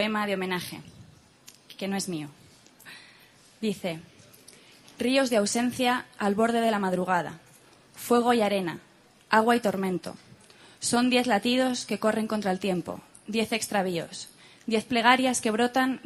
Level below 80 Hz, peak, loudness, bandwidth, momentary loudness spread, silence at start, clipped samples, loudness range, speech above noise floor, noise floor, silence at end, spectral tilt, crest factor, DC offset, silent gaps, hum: -68 dBFS; -4 dBFS; -26 LUFS; 14.5 kHz; 18 LU; 0 s; under 0.1%; 10 LU; 30 dB; -56 dBFS; 0.05 s; -4 dB/octave; 24 dB; under 0.1%; none; none